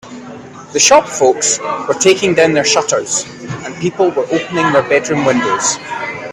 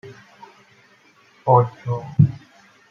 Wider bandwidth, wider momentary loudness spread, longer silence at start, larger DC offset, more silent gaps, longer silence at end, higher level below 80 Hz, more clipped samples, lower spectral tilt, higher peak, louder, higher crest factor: first, 14 kHz vs 6.6 kHz; first, 15 LU vs 12 LU; about the same, 0.05 s vs 0.05 s; neither; neither; second, 0 s vs 0.55 s; first, -54 dBFS vs -60 dBFS; neither; second, -2.5 dB/octave vs -10.5 dB/octave; about the same, 0 dBFS vs -2 dBFS; first, -13 LUFS vs -20 LUFS; second, 14 dB vs 20 dB